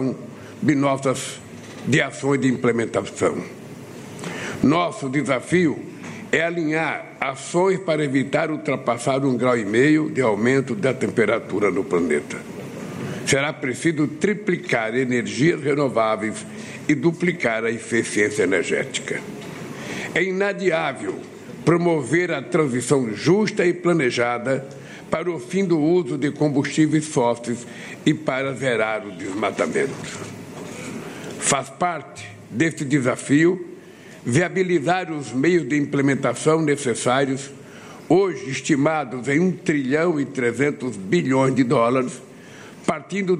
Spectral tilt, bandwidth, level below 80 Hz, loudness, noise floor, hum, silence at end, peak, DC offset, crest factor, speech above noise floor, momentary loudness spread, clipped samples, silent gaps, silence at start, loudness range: -5.5 dB/octave; 12.5 kHz; -60 dBFS; -21 LUFS; -42 dBFS; none; 0 s; -4 dBFS; under 0.1%; 18 dB; 21 dB; 14 LU; under 0.1%; none; 0 s; 3 LU